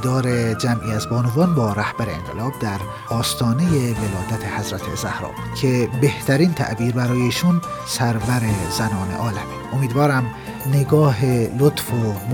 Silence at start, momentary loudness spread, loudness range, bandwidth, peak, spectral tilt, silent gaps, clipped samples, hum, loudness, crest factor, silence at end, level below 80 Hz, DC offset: 0 s; 8 LU; 3 LU; 19.5 kHz; -4 dBFS; -6 dB/octave; none; under 0.1%; none; -20 LUFS; 16 dB; 0 s; -44 dBFS; under 0.1%